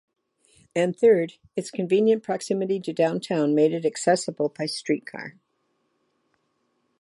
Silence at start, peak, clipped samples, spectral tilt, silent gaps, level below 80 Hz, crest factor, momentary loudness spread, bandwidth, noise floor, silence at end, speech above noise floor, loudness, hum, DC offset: 0.75 s; -8 dBFS; under 0.1%; -5.5 dB/octave; none; -76 dBFS; 16 dB; 11 LU; 11.5 kHz; -72 dBFS; 1.7 s; 49 dB; -24 LUFS; none; under 0.1%